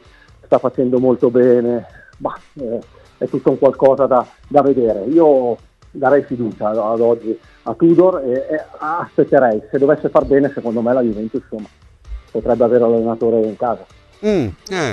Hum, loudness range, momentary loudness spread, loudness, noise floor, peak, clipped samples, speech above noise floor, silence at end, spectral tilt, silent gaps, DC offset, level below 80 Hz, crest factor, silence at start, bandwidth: none; 3 LU; 13 LU; -16 LUFS; -45 dBFS; 0 dBFS; under 0.1%; 30 dB; 0 s; -8 dB/octave; none; under 0.1%; -44 dBFS; 16 dB; 0.5 s; 8.6 kHz